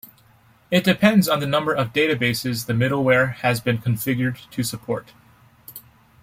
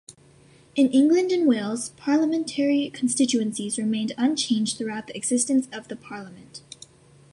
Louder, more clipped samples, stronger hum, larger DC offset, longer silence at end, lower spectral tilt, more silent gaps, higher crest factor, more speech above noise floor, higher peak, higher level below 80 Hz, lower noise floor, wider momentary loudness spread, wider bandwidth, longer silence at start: about the same, -21 LUFS vs -23 LUFS; neither; neither; neither; second, 0.45 s vs 0.75 s; first, -5.5 dB/octave vs -3.5 dB/octave; neither; about the same, 18 dB vs 16 dB; about the same, 34 dB vs 31 dB; first, -2 dBFS vs -8 dBFS; first, -56 dBFS vs -68 dBFS; about the same, -55 dBFS vs -54 dBFS; second, 13 LU vs 19 LU; first, 16.5 kHz vs 11.5 kHz; first, 0.7 s vs 0.1 s